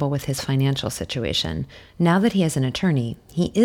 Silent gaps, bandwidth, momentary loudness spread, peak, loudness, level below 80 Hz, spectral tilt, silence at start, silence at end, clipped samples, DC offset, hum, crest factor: none; 17 kHz; 9 LU; -6 dBFS; -22 LUFS; -46 dBFS; -5.5 dB/octave; 0 s; 0 s; under 0.1%; under 0.1%; none; 16 dB